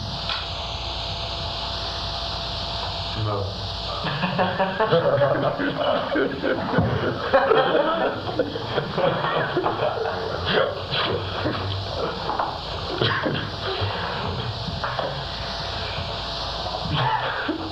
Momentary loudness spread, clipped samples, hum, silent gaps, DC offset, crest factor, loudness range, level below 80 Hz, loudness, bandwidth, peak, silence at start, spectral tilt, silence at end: 7 LU; under 0.1%; none; none; under 0.1%; 20 dB; 5 LU; -40 dBFS; -24 LUFS; 13.5 kHz; -4 dBFS; 0 s; -6 dB/octave; 0 s